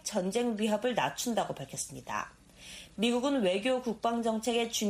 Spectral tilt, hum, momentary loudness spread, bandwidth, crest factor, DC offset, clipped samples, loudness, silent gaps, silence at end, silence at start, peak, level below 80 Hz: -3.5 dB/octave; none; 13 LU; 15.5 kHz; 16 dB; under 0.1%; under 0.1%; -31 LUFS; none; 0 s; 0.05 s; -16 dBFS; -64 dBFS